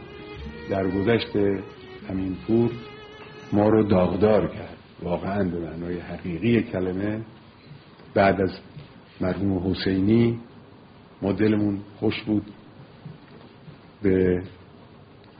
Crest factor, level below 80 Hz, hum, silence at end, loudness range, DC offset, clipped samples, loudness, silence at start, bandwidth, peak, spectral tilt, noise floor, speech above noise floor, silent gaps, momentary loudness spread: 18 dB; -50 dBFS; none; 0.35 s; 4 LU; under 0.1%; under 0.1%; -24 LUFS; 0 s; 5.2 kHz; -6 dBFS; -6.5 dB/octave; -49 dBFS; 26 dB; none; 21 LU